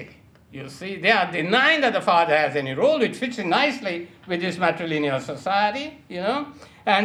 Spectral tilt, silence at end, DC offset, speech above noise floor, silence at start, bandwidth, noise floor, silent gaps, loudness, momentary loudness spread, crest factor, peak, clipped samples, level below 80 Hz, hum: -5 dB/octave; 0 s; under 0.1%; 26 dB; 0 s; 13 kHz; -49 dBFS; none; -22 LUFS; 14 LU; 20 dB; -2 dBFS; under 0.1%; -64 dBFS; none